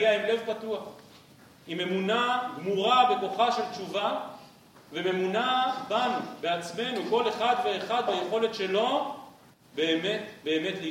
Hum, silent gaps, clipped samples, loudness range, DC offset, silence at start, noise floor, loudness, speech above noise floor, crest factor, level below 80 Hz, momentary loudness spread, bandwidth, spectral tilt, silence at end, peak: none; none; under 0.1%; 2 LU; under 0.1%; 0 s; -54 dBFS; -28 LUFS; 27 dB; 20 dB; -76 dBFS; 10 LU; 16.5 kHz; -4.5 dB/octave; 0 s; -10 dBFS